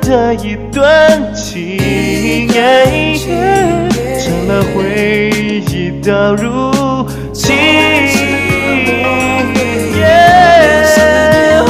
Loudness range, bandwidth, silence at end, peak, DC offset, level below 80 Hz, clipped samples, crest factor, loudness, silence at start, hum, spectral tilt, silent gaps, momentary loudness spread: 4 LU; 16 kHz; 0 s; 0 dBFS; 0.5%; -30 dBFS; 0.4%; 10 dB; -10 LUFS; 0 s; none; -5 dB/octave; none; 9 LU